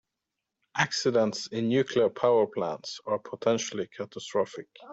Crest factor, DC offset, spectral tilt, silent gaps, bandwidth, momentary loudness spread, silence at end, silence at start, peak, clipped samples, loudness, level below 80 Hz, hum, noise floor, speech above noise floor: 20 dB; under 0.1%; -4.5 dB/octave; none; 8 kHz; 12 LU; 0 s; 0.75 s; -8 dBFS; under 0.1%; -28 LUFS; -72 dBFS; none; -86 dBFS; 58 dB